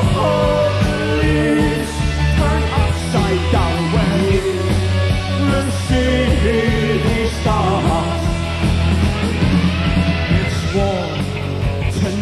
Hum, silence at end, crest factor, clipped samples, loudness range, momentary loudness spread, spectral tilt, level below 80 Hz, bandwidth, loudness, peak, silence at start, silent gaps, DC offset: none; 0 s; 14 dB; under 0.1%; 1 LU; 4 LU; -6 dB/octave; -24 dBFS; 13 kHz; -17 LUFS; -2 dBFS; 0 s; none; under 0.1%